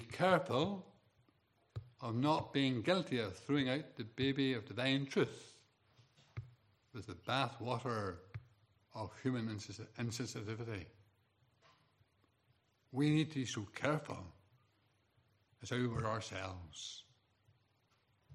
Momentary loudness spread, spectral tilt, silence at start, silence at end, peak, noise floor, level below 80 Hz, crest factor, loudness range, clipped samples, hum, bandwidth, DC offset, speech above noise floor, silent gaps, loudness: 19 LU; -5.5 dB/octave; 0 s; 0 s; -18 dBFS; -77 dBFS; -74 dBFS; 24 dB; 8 LU; under 0.1%; none; 13.5 kHz; under 0.1%; 38 dB; none; -39 LUFS